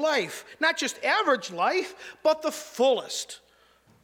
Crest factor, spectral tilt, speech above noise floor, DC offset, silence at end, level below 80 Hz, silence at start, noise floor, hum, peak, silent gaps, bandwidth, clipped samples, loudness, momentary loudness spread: 18 dB; -2 dB/octave; 34 dB; under 0.1%; 0.65 s; -76 dBFS; 0 s; -61 dBFS; none; -8 dBFS; none; 18 kHz; under 0.1%; -26 LUFS; 11 LU